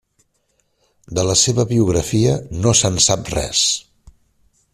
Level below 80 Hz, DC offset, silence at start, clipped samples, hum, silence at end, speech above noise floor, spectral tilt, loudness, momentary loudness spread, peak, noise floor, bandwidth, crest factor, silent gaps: -40 dBFS; under 0.1%; 1.1 s; under 0.1%; none; 0.95 s; 49 dB; -3.5 dB/octave; -16 LUFS; 6 LU; -2 dBFS; -65 dBFS; 14.5 kHz; 18 dB; none